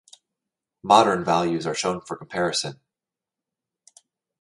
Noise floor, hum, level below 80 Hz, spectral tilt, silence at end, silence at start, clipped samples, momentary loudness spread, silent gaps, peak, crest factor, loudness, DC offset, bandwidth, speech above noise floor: -89 dBFS; none; -62 dBFS; -4 dB/octave; 1.65 s; 0.85 s; under 0.1%; 15 LU; none; -2 dBFS; 24 dB; -22 LUFS; under 0.1%; 11.5 kHz; 67 dB